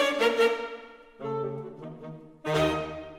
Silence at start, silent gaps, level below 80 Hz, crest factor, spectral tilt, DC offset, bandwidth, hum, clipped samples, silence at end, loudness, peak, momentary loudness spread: 0 s; none; -54 dBFS; 16 dB; -5 dB/octave; under 0.1%; 16 kHz; none; under 0.1%; 0 s; -28 LUFS; -12 dBFS; 20 LU